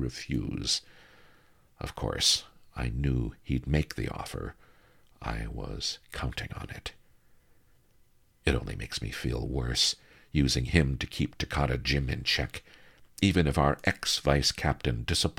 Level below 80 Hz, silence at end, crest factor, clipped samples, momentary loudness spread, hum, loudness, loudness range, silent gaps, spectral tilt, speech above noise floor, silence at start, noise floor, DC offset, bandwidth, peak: -40 dBFS; 0.05 s; 24 dB; under 0.1%; 14 LU; none; -30 LUFS; 10 LU; none; -4 dB/octave; 33 dB; 0 s; -62 dBFS; under 0.1%; 16.5 kHz; -6 dBFS